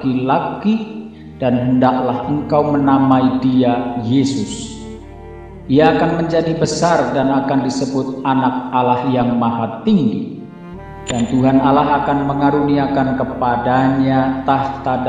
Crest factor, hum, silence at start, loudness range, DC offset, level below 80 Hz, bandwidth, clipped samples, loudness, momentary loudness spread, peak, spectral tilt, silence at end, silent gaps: 16 dB; none; 0 s; 2 LU; 0.1%; -42 dBFS; 9.4 kHz; under 0.1%; -16 LUFS; 16 LU; 0 dBFS; -6.5 dB/octave; 0 s; none